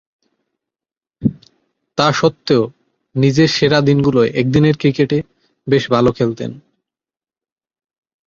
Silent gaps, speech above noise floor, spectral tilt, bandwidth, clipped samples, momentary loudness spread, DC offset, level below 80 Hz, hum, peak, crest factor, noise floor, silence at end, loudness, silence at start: none; over 76 dB; -6.5 dB/octave; 7.4 kHz; under 0.1%; 12 LU; under 0.1%; -48 dBFS; none; -2 dBFS; 16 dB; under -90 dBFS; 1.7 s; -15 LUFS; 1.2 s